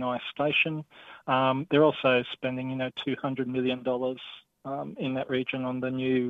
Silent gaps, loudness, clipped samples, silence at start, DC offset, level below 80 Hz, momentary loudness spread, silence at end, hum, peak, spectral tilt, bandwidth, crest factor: none; -28 LUFS; under 0.1%; 0 s; under 0.1%; -68 dBFS; 14 LU; 0 s; none; -10 dBFS; -8 dB/octave; 4.7 kHz; 18 dB